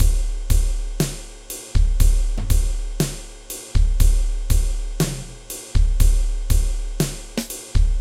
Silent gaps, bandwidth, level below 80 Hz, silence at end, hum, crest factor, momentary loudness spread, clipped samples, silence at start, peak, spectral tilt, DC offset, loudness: none; 16 kHz; -18 dBFS; 0 s; none; 16 dB; 13 LU; under 0.1%; 0 s; -2 dBFS; -5 dB/octave; under 0.1%; -24 LUFS